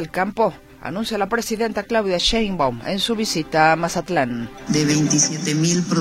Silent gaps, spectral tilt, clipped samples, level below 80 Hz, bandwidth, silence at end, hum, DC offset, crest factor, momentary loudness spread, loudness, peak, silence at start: none; -3.5 dB/octave; under 0.1%; -42 dBFS; 15.5 kHz; 0 s; none; under 0.1%; 18 dB; 7 LU; -20 LUFS; -2 dBFS; 0 s